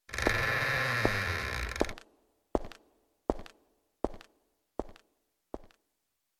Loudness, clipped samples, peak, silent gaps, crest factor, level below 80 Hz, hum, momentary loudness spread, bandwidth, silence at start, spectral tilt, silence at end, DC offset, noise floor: -33 LUFS; under 0.1%; -10 dBFS; none; 26 dB; -46 dBFS; none; 20 LU; 19 kHz; 0.1 s; -4.5 dB/octave; 0.75 s; under 0.1%; -82 dBFS